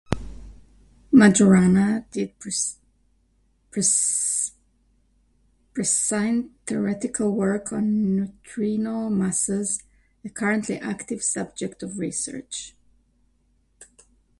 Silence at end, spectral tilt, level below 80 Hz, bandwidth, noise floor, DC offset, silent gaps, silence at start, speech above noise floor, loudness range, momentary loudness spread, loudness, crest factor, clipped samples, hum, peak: 0.55 s; -4.5 dB/octave; -50 dBFS; 11.5 kHz; -65 dBFS; under 0.1%; none; 0.1 s; 42 dB; 8 LU; 16 LU; -23 LUFS; 20 dB; under 0.1%; none; -4 dBFS